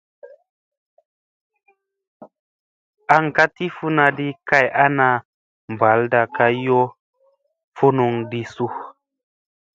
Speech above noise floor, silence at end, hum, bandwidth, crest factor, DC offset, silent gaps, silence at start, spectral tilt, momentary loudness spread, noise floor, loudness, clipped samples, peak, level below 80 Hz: 46 dB; 0.85 s; none; 7.8 kHz; 20 dB; under 0.1%; 0.50-0.97 s, 1.05-1.50 s, 2.07-2.20 s, 2.39-2.93 s, 5.25-5.68 s, 6.99-7.13 s, 7.64-7.72 s; 0.25 s; -7 dB/octave; 11 LU; -63 dBFS; -18 LUFS; under 0.1%; 0 dBFS; -64 dBFS